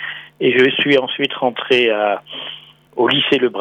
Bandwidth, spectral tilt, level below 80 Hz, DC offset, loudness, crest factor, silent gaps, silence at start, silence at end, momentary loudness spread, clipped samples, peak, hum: 8.8 kHz; -5.5 dB/octave; -64 dBFS; under 0.1%; -15 LUFS; 16 dB; none; 0 s; 0 s; 15 LU; under 0.1%; -2 dBFS; none